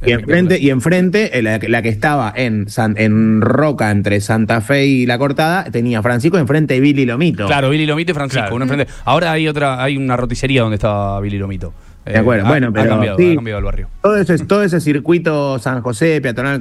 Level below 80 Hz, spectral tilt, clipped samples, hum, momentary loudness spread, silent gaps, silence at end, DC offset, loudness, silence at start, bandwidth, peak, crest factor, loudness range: -34 dBFS; -6.5 dB/octave; under 0.1%; none; 5 LU; none; 0 s; under 0.1%; -14 LUFS; 0 s; 12.5 kHz; 0 dBFS; 14 dB; 2 LU